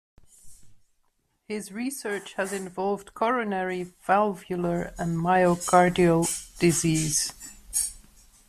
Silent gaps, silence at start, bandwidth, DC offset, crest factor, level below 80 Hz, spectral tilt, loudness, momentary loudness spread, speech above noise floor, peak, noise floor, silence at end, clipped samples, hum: none; 0.45 s; 15.5 kHz; under 0.1%; 22 dB; -52 dBFS; -4.5 dB/octave; -25 LUFS; 12 LU; 46 dB; -6 dBFS; -70 dBFS; 0.5 s; under 0.1%; none